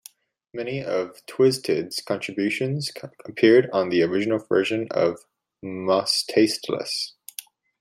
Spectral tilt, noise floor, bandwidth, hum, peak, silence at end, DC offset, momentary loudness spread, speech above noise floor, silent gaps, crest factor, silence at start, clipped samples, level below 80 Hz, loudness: -4.5 dB/octave; -51 dBFS; 15.5 kHz; none; -4 dBFS; 0.4 s; under 0.1%; 18 LU; 28 dB; none; 18 dB; 0.55 s; under 0.1%; -70 dBFS; -23 LUFS